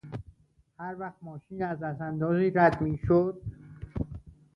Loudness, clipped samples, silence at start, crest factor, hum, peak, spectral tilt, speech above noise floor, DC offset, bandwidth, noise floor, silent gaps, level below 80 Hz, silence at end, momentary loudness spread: -28 LUFS; under 0.1%; 0.05 s; 20 dB; none; -8 dBFS; -10 dB/octave; 34 dB; under 0.1%; 6 kHz; -61 dBFS; none; -50 dBFS; 0.25 s; 20 LU